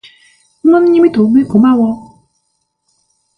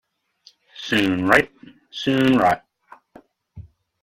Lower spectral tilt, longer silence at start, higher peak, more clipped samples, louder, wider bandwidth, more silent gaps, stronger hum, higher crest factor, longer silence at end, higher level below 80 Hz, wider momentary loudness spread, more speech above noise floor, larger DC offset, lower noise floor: first, -9 dB/octave vs -5.5 dB/octave; about the same, 0.65 s vs 0.75 s; about the same, 0 dBFS vs 0 dBFS; neither; first, -10 LUFS vs -19 LUFS; second, 9.6 kHz vs 16 kHz; neither; neither; second, 12 dB vs 22 dB; first, 1.35 s vs 0.4 s; about the same, -50 dBFS vs -52 dBFS; second, 8 LU vs 14 LU; first, 57 dB vs 37 dB; neither; first, -66 dBFS vs -56 dBFS